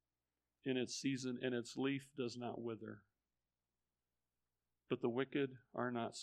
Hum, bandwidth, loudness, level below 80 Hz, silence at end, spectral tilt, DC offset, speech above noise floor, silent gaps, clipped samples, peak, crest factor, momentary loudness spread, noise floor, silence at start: 60 Hz at -75 dBFS; 12 kHz; -43 LUFS; -88 dBFS; 0 s; -5 dB/octave; under 0.1%; over 48 dB; none; under 0.1%; -24 dBFS; 20 dB; 8 LU; under -90 dBFS; 0.65 s